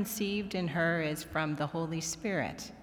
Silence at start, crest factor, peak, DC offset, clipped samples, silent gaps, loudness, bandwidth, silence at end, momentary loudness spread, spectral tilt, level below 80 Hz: 0 s; 16 dB; -18 dBFS; under 0.1%; under 0.1%; none; -33 LUFS; over 20 kHz; 0 s; 5 LU; -4.5 dB/octave; -60 dBFS